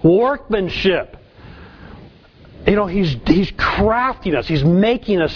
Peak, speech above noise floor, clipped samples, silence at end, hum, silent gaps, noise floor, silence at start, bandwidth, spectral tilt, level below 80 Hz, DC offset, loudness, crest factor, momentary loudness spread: 0 dBFS; 28 dB; under 0.1%; 0 s; none; none; -44 dBFS; 0 s; 5.4 kHz; -8 dB/octave; -34 dBFS; under 0.1%; -17 LUFS; 18 dB; 6 LU